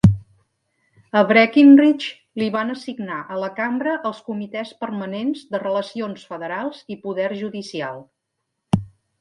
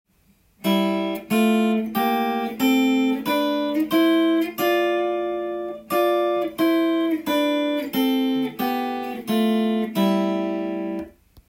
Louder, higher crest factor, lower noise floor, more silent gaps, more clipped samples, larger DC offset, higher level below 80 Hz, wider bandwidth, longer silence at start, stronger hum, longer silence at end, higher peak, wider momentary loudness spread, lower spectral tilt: about the same, -20 LUFS vs -22 LUFS; first, 20 dB vs 14 dB; first, -77 dBFS vs -60 dBFS; neither; neither; neither; first, -46 dBFS vs -62 dBFS; second, 10.5 kHz vs 16.5 kHz; second, 0.05 s vs 0.65 s; neither; about the same, 0.35 s vs 0.4 s; first, -2 dBFS vs -8 dBFS; first, 17 LU vs 8 LU; first, -7.5 dB/octave vs -5.5 dB/octave